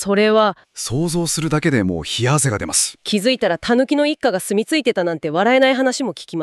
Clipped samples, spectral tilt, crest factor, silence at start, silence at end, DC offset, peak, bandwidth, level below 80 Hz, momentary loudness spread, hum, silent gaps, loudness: under 0.1%; -4 dB/octave; 14 dB; 0 s; 0 s; under 0.1%; -4 dBFS; 14 kHz; -48 dBFS; 7 LU; none; none; -17 LUFS